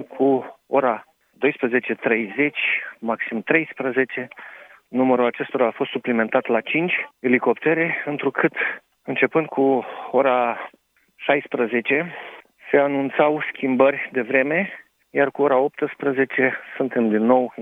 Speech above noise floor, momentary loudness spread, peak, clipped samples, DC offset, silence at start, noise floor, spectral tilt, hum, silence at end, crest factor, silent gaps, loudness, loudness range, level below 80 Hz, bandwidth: 22 dB; 9 LU; -2 dBFS; under 0.1%; under 0.1%; 0 s; -43 dBFS; -8 dB/octave; none; 0 s; 20 dB; none; -21 LUFS; 2 LU; -76 dBFS; 3.9 kHz